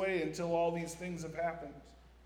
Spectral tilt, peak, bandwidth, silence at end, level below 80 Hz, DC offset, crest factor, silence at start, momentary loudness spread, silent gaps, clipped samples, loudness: -5.5 dB/octave; -22 dBFS; 17.5 kHz; 0 s; -60 dBFS; under 0.1%; 16 dB; 0 s; 15 LU; none; under 0.1%; -37 LUFS